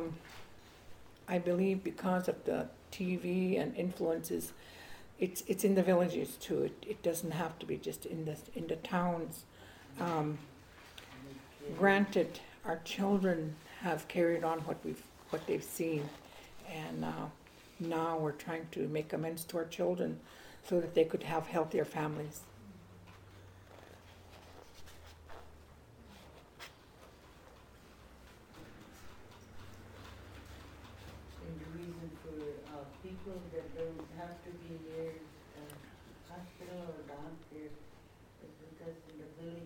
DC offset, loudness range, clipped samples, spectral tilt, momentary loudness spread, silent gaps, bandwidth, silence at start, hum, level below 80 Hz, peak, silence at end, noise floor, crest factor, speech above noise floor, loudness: under 0.1%; 21 LU; under 0.1%; -6 dB/octave; 24 LU; none; 17.5 kHz; 0 s; none; -64 dBFS; -14 dBFS; 0 s; -59 dBFS; 26 dB; 24 dB; -37 LUFS